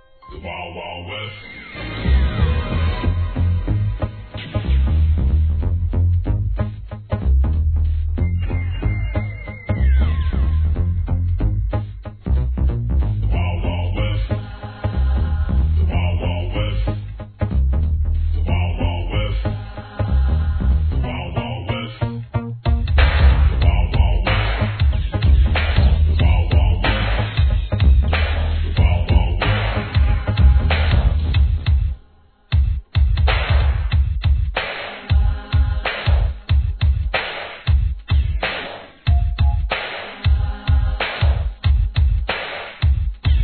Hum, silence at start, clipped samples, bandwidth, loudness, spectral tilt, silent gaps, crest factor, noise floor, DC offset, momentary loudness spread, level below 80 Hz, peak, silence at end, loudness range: none; 0.25 s; under 0.1%; 4.5 kHz; -20 LUFS; -10 dB/octave; none; 16 dB; -50 dBFS; under 0.1%; 10 LU; -20 dBFS; -2 dBFS; 0 s; 4 LU